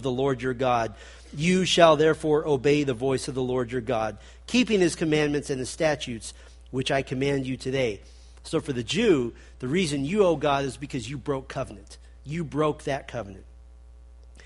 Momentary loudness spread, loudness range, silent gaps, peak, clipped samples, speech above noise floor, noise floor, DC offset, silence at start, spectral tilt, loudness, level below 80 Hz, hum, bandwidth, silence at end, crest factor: 15 LU; 6 LU; none; -2 dBFS; under 0.1%; 23 dB; -48 dBFS; under 0.1%; 0 s; -5 dB/octave; -25 LUFS; -48 dBFS; none; 11.5 kHz; 0 s; 24 dB